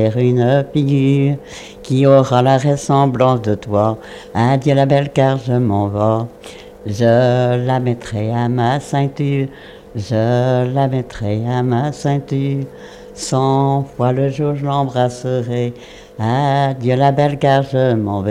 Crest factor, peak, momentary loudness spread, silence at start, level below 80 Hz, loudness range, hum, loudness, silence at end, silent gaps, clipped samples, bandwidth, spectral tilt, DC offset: 16 dB; 0 dBFS; 12 LU; 0 s; -46 dBFS; 4 LU; none; -16 LUFS; 0 s; none; under 0.1%; 10.5 kHz; -7.5 dB/octave; under 0.1%